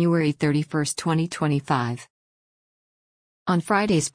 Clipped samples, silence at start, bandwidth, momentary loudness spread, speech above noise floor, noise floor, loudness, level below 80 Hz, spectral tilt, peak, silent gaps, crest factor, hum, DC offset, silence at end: under 0.1%; 0 s; 10.5 kHz; 6 LU; over 68 dB; under -90 dBFS; -24 LUFS; -58 dBFS; -5.5 dB/octave; -8 dBFS; 2.10-3.46 s; 16 dB; none; under 0.1%; 0.05 s